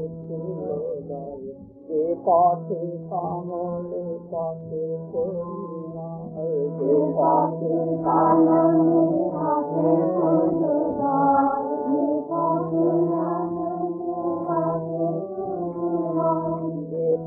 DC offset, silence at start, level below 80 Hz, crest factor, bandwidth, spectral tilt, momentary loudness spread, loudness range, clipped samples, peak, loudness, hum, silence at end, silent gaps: under 0.1%; 0 s; -62 dBFS; 16 dB; 2.1 kHz; -15 dB/octave; 13 LU; 8 LU; under 0.1%; -8 dBFS; -23 LUFS; none; 0 s; none